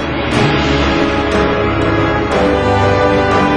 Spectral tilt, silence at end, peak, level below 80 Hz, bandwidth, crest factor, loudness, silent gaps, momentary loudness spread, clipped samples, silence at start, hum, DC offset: -6 dB/octave; 0 s; 0 dBFS; -26 dBFS; 10.5 kHz; 12 dB; -13 LUFS; none; 2 LU; under 0.1%; 0 s; none; under 0.1%